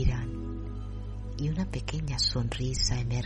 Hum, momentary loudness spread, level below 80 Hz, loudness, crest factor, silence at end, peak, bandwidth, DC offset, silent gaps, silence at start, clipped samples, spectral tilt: 50 Hz at -35 dBFS; 12 LU; -36 dBFS; -31 LUFS; 18 dB; 0 s; -12 dBFS; 11 kHz; under 0.1%; none; 0 s; under 0.1%; -4.5 dB/octave